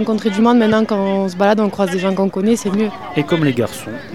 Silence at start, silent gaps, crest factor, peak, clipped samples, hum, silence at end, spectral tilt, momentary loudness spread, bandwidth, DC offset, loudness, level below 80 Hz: 0 s; none; 14 dB; 0 dBFS; under 0.1%; none; 0 s; -6 dB/octave; 7 LU; 13.5 kHz; 0.5%; -16 LUFS; -52 dBFS